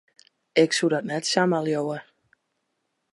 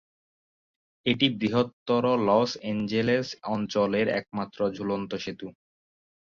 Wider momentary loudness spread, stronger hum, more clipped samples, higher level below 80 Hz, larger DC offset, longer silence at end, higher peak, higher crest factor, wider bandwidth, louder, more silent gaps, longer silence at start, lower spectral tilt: about the same, 8 LU vs 10 LU; neither; neither; second, -78 dBFS vs -64 dBFS; neither; first, 1.1 s vs 0.8 s; about the same, -6 dBFS vs -8 dBFS; about the same, 20 dB vs 20 dB; first, 11.5 kHz vs 7.2 kHz; first, -23 LUFS vs -27 LUFS; second, none vs 1.73-1.86 s; second, 0.55 s vs 1.05 s; second, -4 dB/octave vs -6 dB/octave